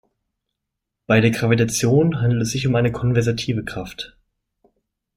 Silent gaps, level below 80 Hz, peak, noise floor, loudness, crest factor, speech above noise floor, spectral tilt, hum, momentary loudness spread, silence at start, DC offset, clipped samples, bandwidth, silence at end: none; -48 dBFS; -2 dBFS; -81 dBFS; -19 LUFS; 18 dB; 62 dB; -5.5 dB/octave; none; 13 LU; 1.1 s; under 0.1%; under 0.1%; 16 kHz; 1.1 s